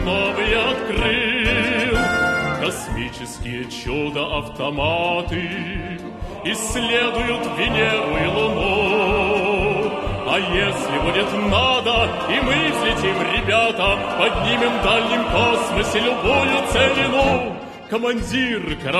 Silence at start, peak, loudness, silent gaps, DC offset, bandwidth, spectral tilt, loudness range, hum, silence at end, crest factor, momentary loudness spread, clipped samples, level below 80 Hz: 0 s; -2 dBFS; -19 LUFS; none; under 0.1%; 13 kHz; -4 dB/octave; 5 LU; none; 0 s; 18 dB; 9 LU; under 0.1%; -34 dBFS